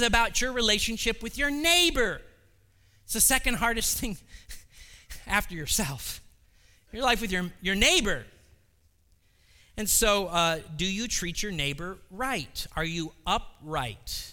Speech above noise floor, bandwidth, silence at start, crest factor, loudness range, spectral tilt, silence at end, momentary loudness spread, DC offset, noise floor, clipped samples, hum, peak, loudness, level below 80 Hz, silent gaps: 38 dB; 19 kHz; 0 s; 22 dB; 6 LU; -2 dB/octave; 0 s; 17 LU; under 0.1%; -65 dBFS; under 0.1%; none; -6 dBFS; -26 LUFS; -40 dBFS; none